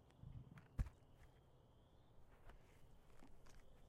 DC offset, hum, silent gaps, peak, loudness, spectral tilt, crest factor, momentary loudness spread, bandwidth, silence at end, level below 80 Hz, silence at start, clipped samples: under 0.1%; none; none; -30 dBFS; -56 LUFS; -7 dB/octave; 26 dB; 18 LU; 14.5 kHz; 0 s; -60 dBFS; 0 s; under 0.1%